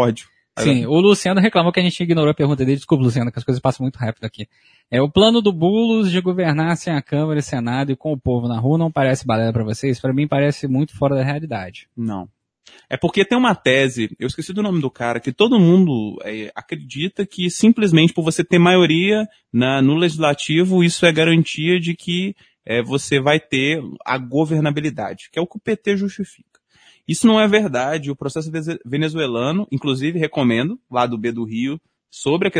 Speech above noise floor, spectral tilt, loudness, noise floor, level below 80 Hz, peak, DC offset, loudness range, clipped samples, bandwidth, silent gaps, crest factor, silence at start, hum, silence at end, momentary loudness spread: 36 dB; -6 dB/octave; -18 LUFS; -54 dBFS; -52 dBFS; 0 dBFS; under 0.1%; 5 LU; under 0.1%; 10.5 kHz; none; 18 dB; 0 s; none; 0 s; 12 LU